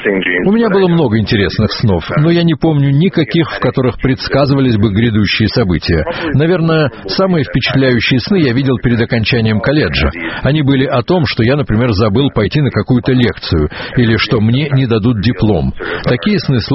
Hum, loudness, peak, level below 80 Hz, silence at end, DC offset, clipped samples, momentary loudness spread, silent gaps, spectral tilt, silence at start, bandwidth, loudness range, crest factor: none; -12 LUFS; 0 dBFS; -30 dBFS; 0 s; under 0.1%; under 0.1%; 4 LU; none; -5.5 dB/octave; 0 s; 6 kHz; 1 LU; 12 dB